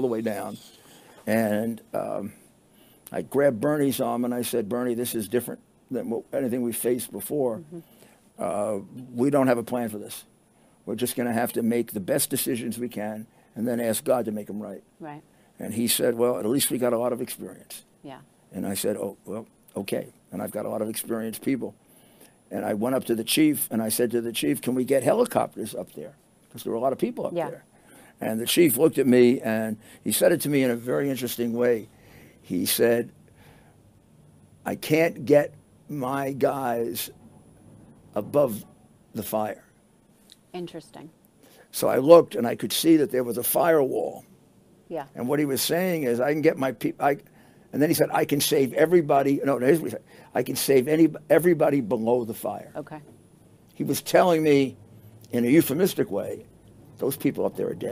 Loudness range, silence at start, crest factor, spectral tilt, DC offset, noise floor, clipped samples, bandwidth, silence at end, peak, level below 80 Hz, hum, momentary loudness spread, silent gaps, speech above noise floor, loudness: 9 LU; 0 s; 24 dB; -4.5 dB/octave; under 0.1%; -59 dBFS; under 0.1%; 16 kHz; 0 s; -2 dBFS; -68 dBFS; none; 17 LU; none; 35 dB; -24 LUFS